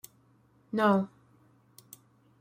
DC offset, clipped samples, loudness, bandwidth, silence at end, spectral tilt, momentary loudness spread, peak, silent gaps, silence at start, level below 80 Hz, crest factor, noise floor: under 0.1%; under 0.1%; -29 LUFS; 16 kHz; 1.35 s; -6.5 dB/octave; 26 LU; -12 dBFS; none; 0.75 s; -76 dBFS; 20 dB; -65 dBFS